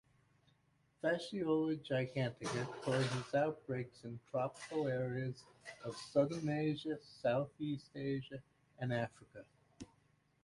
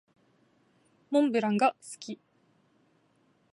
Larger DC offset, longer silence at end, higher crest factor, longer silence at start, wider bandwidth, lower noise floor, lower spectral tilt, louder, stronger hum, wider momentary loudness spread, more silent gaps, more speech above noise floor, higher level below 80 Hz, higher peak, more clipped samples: neither; second, 0.6 s vs 1.4 s; about the same, 20 dB vs 20 dB; about the same, 1.05 s vs 1.1 s; about the same, 11.5 kHz vs 11.5 kHz; first, -75 dBFS vs -68 dBFS; about the same, -6.5 dB/octave vs -5.5 dB/octave; second, -39 LUFS vs -28 LUFS; neither; about the same, 16 LU vs 18 LU; neither; second, 36 dB vs 41 dB; first, -74 dBFS vs -84 dBFS; second, -20 dBFS vs -14 dBFS; neither